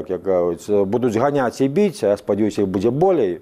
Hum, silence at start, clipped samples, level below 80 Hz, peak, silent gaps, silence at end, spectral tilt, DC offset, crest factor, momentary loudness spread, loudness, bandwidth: none; 0 s; under 0.1%; -54 dBFS; -4 dBFS; none; 0 s; -7 dB/octave; under 0.1%; 14 dB; 3 LU; -19 LUFS; 14.5 kHz